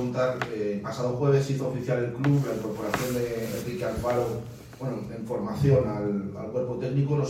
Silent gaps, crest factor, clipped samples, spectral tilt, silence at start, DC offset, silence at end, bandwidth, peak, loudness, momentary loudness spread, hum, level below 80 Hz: none; 18 dB; under 0.1%; -7 dB/octave; 0 s; under 0.1%; 0 s; 16 kHz; -8 dBFS; -28 LUFS; 9 LU; none; -50 dBFS